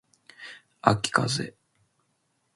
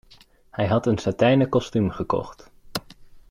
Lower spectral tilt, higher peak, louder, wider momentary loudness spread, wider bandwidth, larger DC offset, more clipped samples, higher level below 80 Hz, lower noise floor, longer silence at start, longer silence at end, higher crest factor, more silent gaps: second, -4 dB/octave vs -7 dB/octave; first, -2 dBFS vs -8 dBFS; about the same, -25 LUFS vs -23 LUFS; first, 21 LU vs 14 LU; second, 11.5 kHz vs 16 kHz; neither; neither; second, -62 dBFS vs -50 dBFS; first, -73 dBFS vs -53 dBFS; second, 0.4 s vs 0.55 s; first, 1.05 s vs 0.1 s; first, 28 dB vs 16 dB; neither